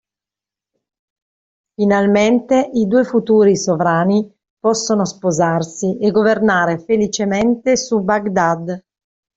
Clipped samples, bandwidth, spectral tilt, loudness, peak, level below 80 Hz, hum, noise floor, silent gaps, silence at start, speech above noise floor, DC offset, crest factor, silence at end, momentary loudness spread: under 0.1%; 8 kHz; -5.5 dB/octave; -16 LUFS; -2 dBFS; -54 dBFS; none; -89 dBFS; 4.50-4.57 s; 1.8 s; 74 dB; under 0.1%; 14 dB; 0.6 s; 6 LU